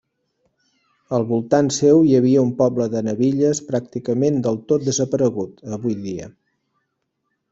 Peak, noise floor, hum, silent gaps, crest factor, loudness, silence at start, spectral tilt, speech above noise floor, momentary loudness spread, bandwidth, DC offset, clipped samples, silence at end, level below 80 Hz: -2 dBFS; -74 dBFS; none; none; 18 dB; -19 LUFS; 1.1 s; -6.5 dB/octave; 56 dB; 12 LU; 8 kHz; under 0.1%; under 0.1%; 1.2 s; -58 dBFS